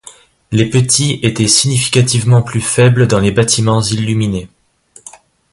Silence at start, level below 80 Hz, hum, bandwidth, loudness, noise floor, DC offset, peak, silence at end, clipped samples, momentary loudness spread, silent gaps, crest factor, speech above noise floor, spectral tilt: 0.05 s; -40 dBFS; none; 11.5 kHz; -12 LUFS; -46 dBFS; under 0.1%; 0 dBFS; 1.05 s; under 0.1%; 6 LU; none; 12 dB; 34 dB; -4.5 dB/octave